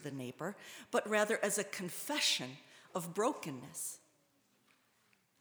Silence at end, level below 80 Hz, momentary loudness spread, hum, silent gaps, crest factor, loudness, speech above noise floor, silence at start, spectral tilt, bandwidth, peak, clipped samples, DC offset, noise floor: 1.45 s; -88 dBFS; 13 LU; none; none; 22 dB; -37 LUFS; 36 dB; 0 s; -2.5 dB/octave; over 20 kHz; -18 dBFS; under 0.1%; under 0.1%; -74 dBFS